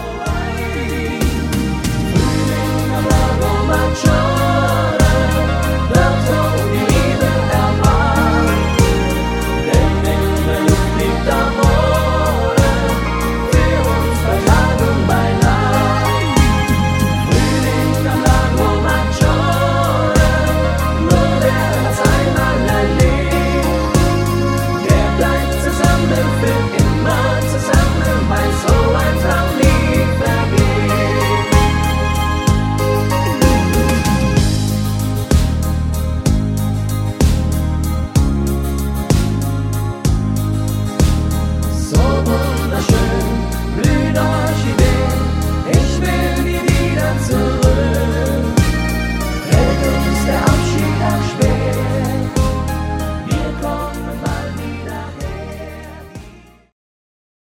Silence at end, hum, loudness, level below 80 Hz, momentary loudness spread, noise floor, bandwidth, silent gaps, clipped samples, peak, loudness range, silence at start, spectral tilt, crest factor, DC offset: 1.2 s; none; -15 LUFS; -20 dBFS; 6 LU; -40 dBFS; 16.5 kHz; none; under 0.1%; 0 dBFS; 3 LU; 0 s; -6 dB/octave; 14 dB; under 0.1%